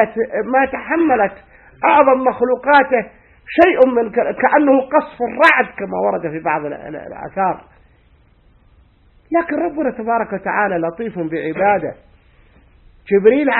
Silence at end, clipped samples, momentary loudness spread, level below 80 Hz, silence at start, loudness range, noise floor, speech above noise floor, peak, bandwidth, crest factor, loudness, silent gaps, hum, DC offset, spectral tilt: 0 s; under 0.1%; 11 LU; -52 dBFS; 0 s; 9 LU; -52 dBFS; 36 dB; 0 dBFS; 6.4 kHz; 16 dB; -16 LUFS; none; none; under 0.1%; -7.5 dB/octave